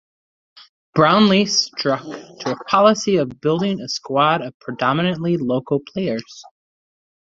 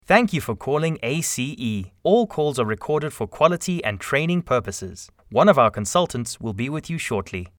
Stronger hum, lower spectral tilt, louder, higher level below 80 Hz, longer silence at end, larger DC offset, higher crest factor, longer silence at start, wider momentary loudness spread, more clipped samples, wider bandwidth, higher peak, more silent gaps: neither; about the same, -5 dB/octave vs -5 dB/octave; first, -18 LUFS vs -22 LUFS; second, -60 dBFS vs -52 dBFS; first, 0.85 s vs 0.1 s; neither; about the same, 18 dB vs 20 dB; first, 0.95 s vs 0.1 s; about the same, 12 LU vs 10 LU; neither; second, 7.8 kHz vs 20 kHz; about the same, -2 dBFS vs -2 dBFS; first, 4.54-4.60 s vs none